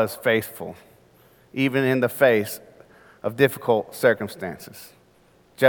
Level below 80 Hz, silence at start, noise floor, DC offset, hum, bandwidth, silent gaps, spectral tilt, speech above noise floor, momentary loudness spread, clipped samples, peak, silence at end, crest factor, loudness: -66 dBFS; 0 s; -57 dBFS; under 0.1%; none; 19 kHz; none; -5.5 dB/octave; 35 dB; 18 LU; under 0.1%; -2 dBFS; 0 s; 22 dB; -22 LUFS